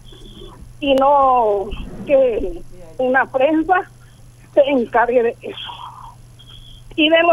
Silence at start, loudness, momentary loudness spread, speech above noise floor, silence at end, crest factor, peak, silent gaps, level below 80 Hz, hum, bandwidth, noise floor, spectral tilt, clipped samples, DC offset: 0.05 s; -16 LUFS; 18 LU; 27 dB; 0 s; 16 dB; -2 dBFS; none; -40 dBFS; none; 12 kHz; -43 dBFS; -5.5 dB/octave; under 0.1%; under 0.1%